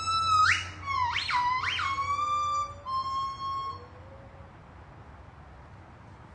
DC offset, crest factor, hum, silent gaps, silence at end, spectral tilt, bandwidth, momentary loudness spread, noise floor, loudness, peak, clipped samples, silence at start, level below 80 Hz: under 0.1%; 18 dB; none; none; 0 s; -2 dB/octave; 11 kHz; 26 LU; -49 dBFS; -28 LUFS; -12 dBFS; under 0.1%; 0 s; -56 dBFS